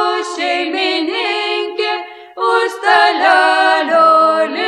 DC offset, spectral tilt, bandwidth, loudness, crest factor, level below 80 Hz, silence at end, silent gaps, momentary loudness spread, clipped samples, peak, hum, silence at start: under 0.1%; -1.5 dB/octave; 12 kHz; -13 LUFS; 14 dB; -70 dBFS; 0 s; none; 9 LU; under 0.1%; 0 dBFS; none; 0 s